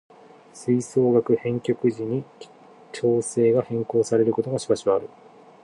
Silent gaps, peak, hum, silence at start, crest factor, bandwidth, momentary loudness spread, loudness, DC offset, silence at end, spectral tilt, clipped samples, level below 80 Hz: none; -8 dBFS; none; 0.55 s; 16 dB; 11.5 kHz; 10 LU; -23 LUFS; under 0.1%; 0.55 s; -6.5 dB/octave; under 0.1%; -66 dBFS